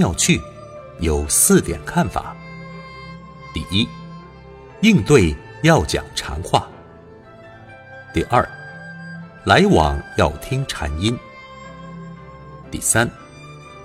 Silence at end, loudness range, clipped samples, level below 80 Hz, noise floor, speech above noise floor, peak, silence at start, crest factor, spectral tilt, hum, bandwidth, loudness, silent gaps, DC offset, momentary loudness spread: 0 s; 5 LU; under 0.1%; -34 dBFS; -42 dBFS; 25 dB; 0 dBFS; 0 s; 20 dB; -4 dB/octave; none; 16.5 kHz; -18 LUFS; none; under 0.1%; 24 LU